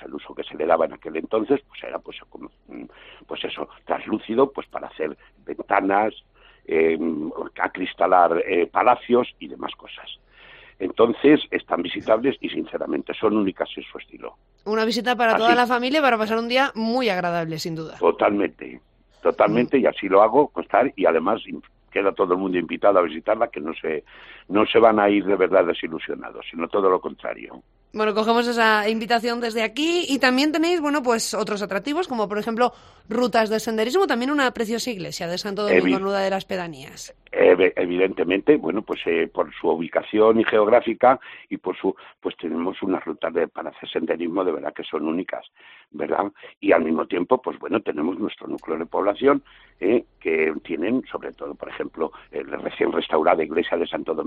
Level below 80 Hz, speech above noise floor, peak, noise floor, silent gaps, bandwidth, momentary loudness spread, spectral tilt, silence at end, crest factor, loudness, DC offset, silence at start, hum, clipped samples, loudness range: -60 dBFS; 26 dB; -2 dBFS; -48 dBFS; 46.57-46.61 s; 14 kHz; 16 LU; -4.5 dB/octave; 0 s; 20 dB; -22 LUFS; under 0.1%; 0 s; none; under 0.1%; 6 LU